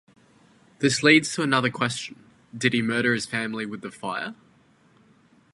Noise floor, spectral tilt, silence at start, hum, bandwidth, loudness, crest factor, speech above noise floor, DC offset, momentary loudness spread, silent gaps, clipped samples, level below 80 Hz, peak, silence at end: -59 dBFS; -4 dB/octave; 0.8 s; none; 11.5 kHz; -23 LUFS; 22 dB; 35 dB; under 0.1%; 16 LU; none; under 0.1%; -68 dBFS; -4 dBFS; 1.2 s